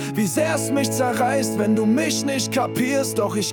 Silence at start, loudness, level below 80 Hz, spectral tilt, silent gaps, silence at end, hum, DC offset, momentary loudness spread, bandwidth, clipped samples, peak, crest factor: 0 s; -21 LUFS; -62 dBFS; -4.5 dB/octave; none; 0 s; none; under 0.1%; 3 LU; 18 kHz; under 0.1%; -8 dBFS; 12 dB